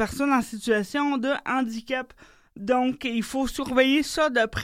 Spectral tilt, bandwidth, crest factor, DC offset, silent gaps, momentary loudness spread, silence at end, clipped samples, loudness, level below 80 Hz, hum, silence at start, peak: -4 dB/octave; 16 kHz; 20 dB; under 0.1%; none; 9 LU; 0 s; under 0.1%; -25 LUFS; -50 dBFS; none; 0 s; -6 dBFS